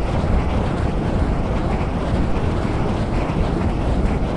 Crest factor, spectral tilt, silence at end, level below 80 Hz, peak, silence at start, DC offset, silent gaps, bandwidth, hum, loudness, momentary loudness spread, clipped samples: 14 dB; -8 dB/octave; 0 s; -24 dBFS; -6 dBFS; 0 s; under 0.1%; none; 11 kHz; none; -21 LUFS; 1 LU; under 0.1%